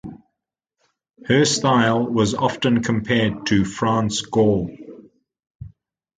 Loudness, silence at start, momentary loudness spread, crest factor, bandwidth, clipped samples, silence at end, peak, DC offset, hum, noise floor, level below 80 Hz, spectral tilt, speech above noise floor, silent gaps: -19 LUFS; 0.05 s; 8 LU; 18 dB; 9.4 kHz; under 0.1%; 0.5 s; -2 dBFS; under 0.1%; none; -82 dBFS; -48 dBFS; -5 dB/octave; 63 dB; 5.55-5.60 s